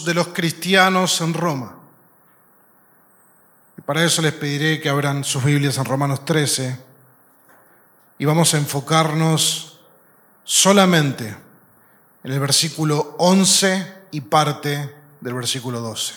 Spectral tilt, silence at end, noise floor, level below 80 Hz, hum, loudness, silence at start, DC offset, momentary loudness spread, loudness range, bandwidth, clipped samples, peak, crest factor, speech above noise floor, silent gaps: -3.5 dB/octave; 0 s; -54 dBFS; -70 dBFS; none; -18 LUFS; 0 s; under 0.1%; 16 LU; 5 LU; 19 kHz; under 0.1%; 0 dBFS; 20 dB; 36 dB; none